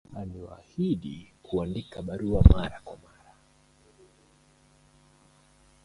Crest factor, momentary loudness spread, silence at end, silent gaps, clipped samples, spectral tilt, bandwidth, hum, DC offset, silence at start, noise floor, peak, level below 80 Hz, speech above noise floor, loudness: 28 dB; 25 LU; 2.9 s; none; under 0.1%; -9 dB/octave; 10.5 kHz; none; under 0.1%; 0.1 s; -61 dBFS; 0 dBFS; -32 dBFS; 36 dB; -27 LUFS